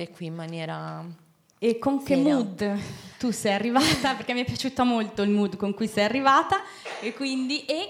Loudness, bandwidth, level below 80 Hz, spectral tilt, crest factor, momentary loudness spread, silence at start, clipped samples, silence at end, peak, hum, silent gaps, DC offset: -25 LUFS; 16.5 kHz; -60 dBFS; -4.5 dB/octave; 18 dB; 13 LU; 0 s; under 0.1%; 0 s; -8 dBFS; none; none; under 0.1%